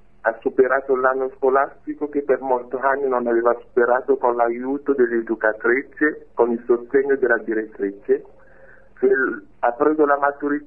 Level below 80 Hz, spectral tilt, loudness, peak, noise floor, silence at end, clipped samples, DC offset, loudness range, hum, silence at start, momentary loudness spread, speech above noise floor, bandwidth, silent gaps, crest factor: -60 dBFS; -9.5 dB/octave; -20 LUFS; -4 dBFS; -49 dBFS; 0 s; under 0.1%; 0.4%; 2 LU; none; 0.25 s; 6 LU; 29 dB; 3 kHz; none; 18 dB